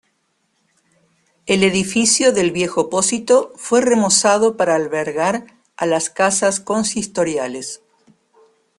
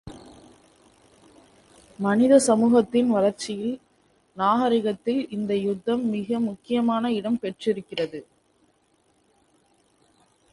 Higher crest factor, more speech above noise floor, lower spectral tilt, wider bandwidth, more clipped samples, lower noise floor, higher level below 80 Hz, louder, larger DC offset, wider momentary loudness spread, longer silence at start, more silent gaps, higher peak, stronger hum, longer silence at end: about the same, 18 dB vs 20 dB; first, 50 dB vs 43 dB; second, -3 dB/octave vs -5.5 dB/octave; about the same, 12.5 kHz vs 11.5 kHz; neither; about the same, -67 dBFS vs -65 dBFS; first, -56 dBFS vs -64 dBFS; first, -17 LUFS vs -23 LUFS; neither; about the same, 11 LU vs 12 LU; first, 1.45 s vs 0.05 s; neither; first, 0 dBFS vs -6 dBFS; neither; second, 1 s vs 2.3 s